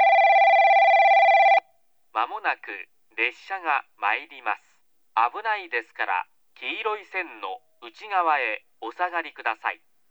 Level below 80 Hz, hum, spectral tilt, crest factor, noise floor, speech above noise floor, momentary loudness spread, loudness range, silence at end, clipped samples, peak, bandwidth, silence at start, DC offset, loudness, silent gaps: -88 dBFS; none; -1 dB/octave; 16 dB; -66 dBFS; 38 dB; 18 LU; 9 LU; 0.35 s; under 0.1%; -8 dBFS; 7.6 kHz; 0 s; under 0.1%; -22 LUFS; none